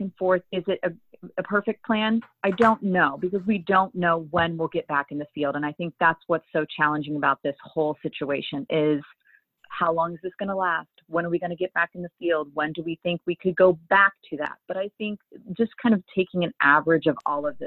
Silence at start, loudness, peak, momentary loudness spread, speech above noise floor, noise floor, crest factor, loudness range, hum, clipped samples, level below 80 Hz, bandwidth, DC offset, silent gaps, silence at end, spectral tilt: 0 s; -24 LUFS; -4 dBFS; 11 LU; 30 dB; -55 dBFS; 20 dB; 4 LU; none; under 0.1%; -62 dBFS; 7.4 kHz; under 0.1%; none; 0 s; -8 dB/octave